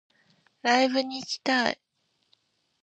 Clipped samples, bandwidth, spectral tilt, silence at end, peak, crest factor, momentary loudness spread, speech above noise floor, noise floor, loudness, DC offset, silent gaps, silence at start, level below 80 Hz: under 0.1%; 8.6 kHz; -2.5 dB/octave; 1.1 s; -8 dBFS; 22 dB; 9 LU; 48 dB; -74 dBFS; -26 LUFS; under 0.1%; none; 0.65 s; -78 dBFS